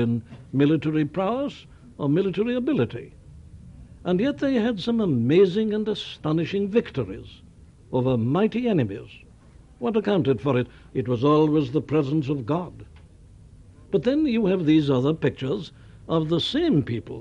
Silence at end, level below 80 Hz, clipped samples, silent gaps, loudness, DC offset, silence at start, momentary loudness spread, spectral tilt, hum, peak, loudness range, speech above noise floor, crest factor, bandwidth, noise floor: 0 s; -52 dBFS; under 0.1%; none; -24 LUFS; under 0.1%; 0 s; 11 LU; -8 dB/octave; none; -8 dBFS; 3 LU; 27 dB; 16 dB; 8.8 kHz; -50 dBFS